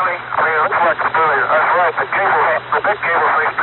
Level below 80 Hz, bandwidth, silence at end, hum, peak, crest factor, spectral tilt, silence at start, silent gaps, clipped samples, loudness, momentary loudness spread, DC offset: -58 dBFS; 4.2 kHz; 0 s; none; -6 dBFS; 10 dB; -1 dB/octave; 0 s; none; under 0.1%; -15 LUFS; 3 LU; under 0.1%